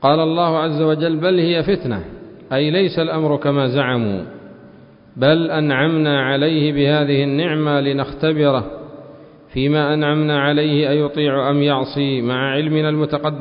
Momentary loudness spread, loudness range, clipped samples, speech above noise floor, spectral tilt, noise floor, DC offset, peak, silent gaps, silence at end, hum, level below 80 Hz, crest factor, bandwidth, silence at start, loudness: 6 LU; 2 LU; under 0.1%; 27 dB; -12 dB/octave; -44 dBFS; under 0.1%; 0 dBFS; none; 0 s; none; -48 dBFS; 16 dB; 5.4 kHz; 0 s; -17 LUFS